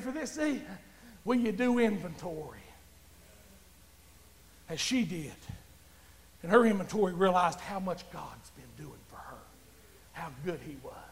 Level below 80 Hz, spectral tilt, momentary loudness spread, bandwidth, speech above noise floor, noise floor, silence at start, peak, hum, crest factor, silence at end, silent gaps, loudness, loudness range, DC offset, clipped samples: -60 dBFS; -5 dB/octave; 23 LU; 16 kHz; 27 dB; -58 dBFS; 0 s; -10 dBFS; none; 24 dB; 0 s; none; -31 LUFS; 9 LU; under 0.1%; under 0.1%